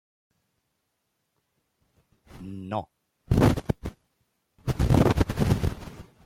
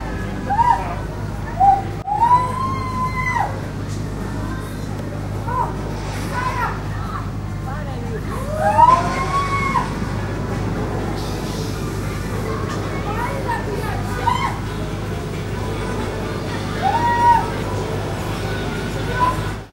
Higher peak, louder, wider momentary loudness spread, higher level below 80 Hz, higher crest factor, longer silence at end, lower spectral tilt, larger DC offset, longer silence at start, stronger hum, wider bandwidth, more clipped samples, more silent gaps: second, -8 dBFS vs -2 dBFS; second, -26 LUFS vs -21 LUFS; first, 20 LU vs 11 LU; second, -38 dBFS vs -32 dBFS; about the same, 20 dB vs 20 dB; first, 0.25 s vs 0 s; first, -7.5 dB/octave vs -6 dB/octave; neither; first, 2.35 s vs 0 s; neither; about the same, 16.5 kHz vs 16 kHz; neither; neither